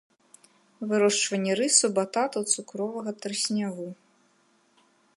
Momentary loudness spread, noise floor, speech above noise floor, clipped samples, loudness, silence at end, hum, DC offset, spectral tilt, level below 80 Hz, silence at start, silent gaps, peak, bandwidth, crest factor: 13 LU; -65 dBFS; 39 dB; under 0.1%; -25 LUFS; 1.2 s; none; under 0.1%; -2.5 dB/octave; -82 dBFS; 0.8 s; none; -6 dBFS; 11.5 kHz; 22 dB